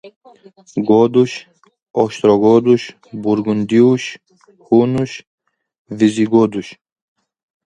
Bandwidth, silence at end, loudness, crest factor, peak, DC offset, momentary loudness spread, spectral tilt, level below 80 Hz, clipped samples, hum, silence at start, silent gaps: 9.4 kHz; 0.9 s; -15 LUFS; 16 dB; 0 dBFS; under 0.1%; 16 LU; -7 dB/octave; -58 dBFS; under 0.1%; none; 0.05 s; 0.16-0.21 s, 1.82-1.86 s, 5.27-5.38 s, 5.78-5.85 s